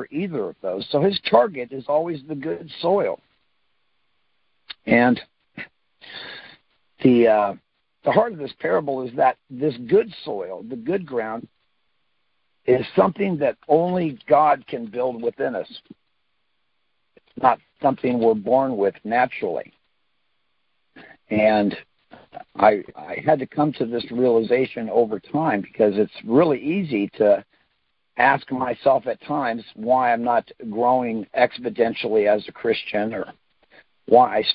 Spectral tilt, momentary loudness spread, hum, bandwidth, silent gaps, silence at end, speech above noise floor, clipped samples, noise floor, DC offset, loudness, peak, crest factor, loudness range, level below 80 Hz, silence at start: -10.5 dB/octave; 13 LU; none; 5.4 kHz; none; 0 s; 54 dB; under 0.1%; -74 dBFS; under 0.1%; -21 LUFS; -2 dBFS; 20 dB; 5 LU; -62 dBFS; 0 s